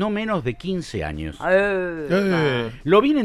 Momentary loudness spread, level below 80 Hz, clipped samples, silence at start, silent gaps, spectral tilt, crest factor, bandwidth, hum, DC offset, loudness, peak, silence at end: 10 LU; -42 dBFS; under 0.1%; 0 s; none; -6.5 dB/octave; 16 dB; 13 kHz; none; under 0.1%; -22 LUFS; -4 dBFS; 0 s